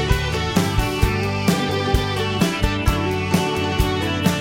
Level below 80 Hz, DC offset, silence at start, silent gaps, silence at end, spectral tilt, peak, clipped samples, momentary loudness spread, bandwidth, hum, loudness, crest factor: -28 dBFS; under 0.1%; 0 s; none; 0 s; -5 dB/octave; -2 dBFS; under 0.1%; 1 LU; 16.5 kHz; none; -20 LUFS; 16 dB